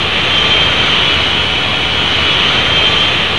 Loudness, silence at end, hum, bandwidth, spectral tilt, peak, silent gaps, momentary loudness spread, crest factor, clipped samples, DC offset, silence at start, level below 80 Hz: -9 LUFS; 0 s; none; 11 kHz; -3 dB/octave; 0 dBFS; none; 3 LU; 12 dB; under 0.1%; 4%; 0 s; -30 dBFS